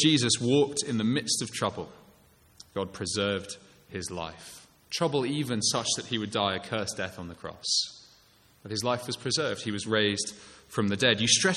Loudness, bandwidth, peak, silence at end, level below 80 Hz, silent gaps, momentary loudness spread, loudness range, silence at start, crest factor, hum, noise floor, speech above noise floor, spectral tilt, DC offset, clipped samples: -28 LUFS; 14.5 kHz; -8 dBFS; 0 s; -64 dBFS; none; 16 LU; 5 LU; 0 s; 22 dB; none; -61 dBFS; 32 dB; -3 dB/octave; under 0.1%; under 0.1%